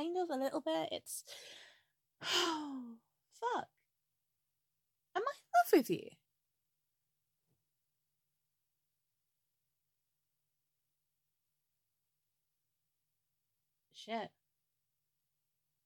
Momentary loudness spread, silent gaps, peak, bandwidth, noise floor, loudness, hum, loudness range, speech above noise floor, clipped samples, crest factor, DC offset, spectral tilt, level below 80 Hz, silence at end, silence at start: 22 LU; none; -16 dBFS; 17 kHz; -88 dBFS; -37 LUFS; none; 15 LU; 50 dB; under 0.1%; 26 dB; under 0.1%; -3 dB/octave; under -90 dBFS; 1.55 s; 0 s